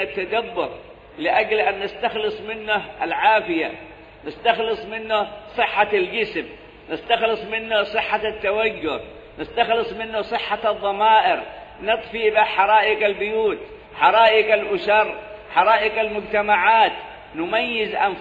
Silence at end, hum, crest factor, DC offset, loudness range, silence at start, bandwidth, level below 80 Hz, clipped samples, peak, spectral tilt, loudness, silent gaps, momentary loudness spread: 0 s; none; 20 dB; under 0.1%; 5 LU; 0 s; 7.8 kHz; -52 dBFS; under 0.1%; -2 dBFS; -5.5 dB/octave; -20 LUFS; none; 14 LU